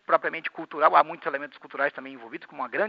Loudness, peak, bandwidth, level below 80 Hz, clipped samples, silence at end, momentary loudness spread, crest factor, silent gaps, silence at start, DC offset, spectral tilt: -25 LUFS; -4 dBFS; 5.4 kHz; under -90 dBFS; under 0.1%; 0 s; 20 LU; 22 dB; none; 0.1 s; under 0.1%; -1.5 dB/octave